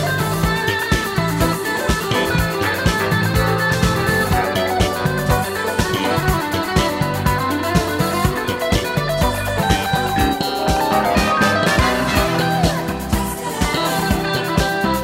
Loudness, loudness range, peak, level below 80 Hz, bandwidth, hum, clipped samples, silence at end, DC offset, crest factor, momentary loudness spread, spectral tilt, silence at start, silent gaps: -18 LUFS; 2 LU; -2 dBFS; -28 dBFS; 16.5 kHz; none; under 0.1%; 0 s; under 0.1%; 16 dB; 4 LU; -4.5 dB/octave; 0 s; none